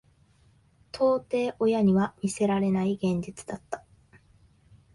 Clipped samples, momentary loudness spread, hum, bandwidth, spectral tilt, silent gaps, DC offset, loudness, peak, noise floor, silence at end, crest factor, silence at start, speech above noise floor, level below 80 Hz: under 0.1%; 16 LU; none; 11.5 kHz; -7 dB/octave; none; under 0.1%; -26 LUFS; -12 dBFS; -62 dBFS; 1.15 s; 16 dB; 0.95 s; 36 dB; -60 dBFS